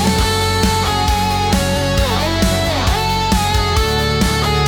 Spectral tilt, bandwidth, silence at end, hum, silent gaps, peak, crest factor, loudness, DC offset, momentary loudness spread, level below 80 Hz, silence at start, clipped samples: -4.5 dB/octave; 18 kHz; 0 s; none; none; -4 dBFS; 12 dB; -15 LUFS; under 0.1%; 1 LU; -22 dBFS; 0 s; under 0.1%